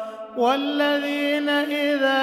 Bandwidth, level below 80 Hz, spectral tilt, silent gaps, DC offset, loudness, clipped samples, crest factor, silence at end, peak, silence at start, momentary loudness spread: 15.5 kHz; -76 dBFS; -3 dB/octave; none; under 0.1%; -22 LUFS; under 0.1%; 14 dB; 0 s; -8 dBFS; 0 s; 2 LU